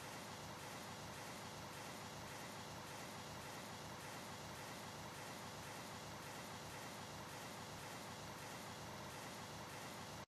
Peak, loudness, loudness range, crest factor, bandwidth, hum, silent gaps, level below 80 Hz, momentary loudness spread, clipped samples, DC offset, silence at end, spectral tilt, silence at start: -40 dBFS; -51 LUFS; 0 LU; 12 dB; 14 kHz; none; none; -74 dBFS; 0 LU; under 0.1%; under 0.1%; 0 s; -3.5 dB/octave; 0 s